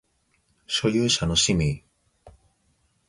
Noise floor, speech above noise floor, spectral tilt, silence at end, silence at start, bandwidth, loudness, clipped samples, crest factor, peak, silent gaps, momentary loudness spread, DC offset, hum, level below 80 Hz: -68 dBFS; 46 dB; -3.5 dB/octave; 0.8 s; 0.7 s; 11.5 kHz; -22 LUFS; under 0.1%; 18 dB; -8 dBFS; none; 8 LU; under 0.1%; none; -44 dBFS